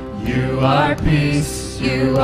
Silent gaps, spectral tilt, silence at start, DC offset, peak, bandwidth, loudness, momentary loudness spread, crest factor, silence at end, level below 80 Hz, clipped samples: none; -6 dB/octave; 0 s; under 0.1%; -4 dBFS; 15.5 kHz; -18 LUFS; 7 LU; 14 dB; 0 s; -30 dBFS; under 0.1%